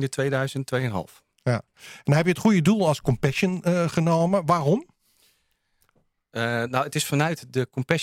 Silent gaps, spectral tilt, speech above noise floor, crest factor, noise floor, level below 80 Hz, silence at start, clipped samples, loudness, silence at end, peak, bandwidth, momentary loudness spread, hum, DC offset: none; -6 dB/octave; 47 dB; 22 dB; -70 dBFS; -56 dBFS; 0 s; under 0.1%; -24 LUFS; 0 s; -2 dBFS; 16 kHz; 9 LU; none; under 0.1%